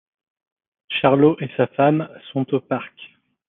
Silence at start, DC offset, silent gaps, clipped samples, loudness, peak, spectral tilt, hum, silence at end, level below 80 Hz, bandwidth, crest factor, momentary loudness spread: 0.9 s; under 0.1%; none; under 0.1%; -20 LUFS; -2 dBFS; -10.5 dB/octave; none; 0.4 s; -64 dBFS; 4 kHz; 20 dB; 12 LU